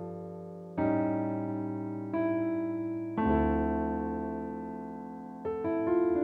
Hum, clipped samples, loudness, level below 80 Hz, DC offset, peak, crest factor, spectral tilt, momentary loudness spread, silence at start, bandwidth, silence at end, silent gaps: none; under 0.1%; -32 LUFS; -46 dBFS; under 0.1%; -16 dBFS; 14 dB; -10.5 dB/octave; 13 LU; 0 s; 3.9 kHz; 0 s; none